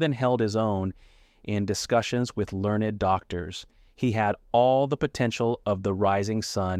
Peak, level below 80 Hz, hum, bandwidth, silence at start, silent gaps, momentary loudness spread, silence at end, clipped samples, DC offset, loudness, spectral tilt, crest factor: -10 dBFS; -52 dBFS; none; 15 kHz; 0 s; none; 9 LU; 0 s; under 0.1%; under 0.1%; -26 LUFS; -6 dB/octave; 16 dB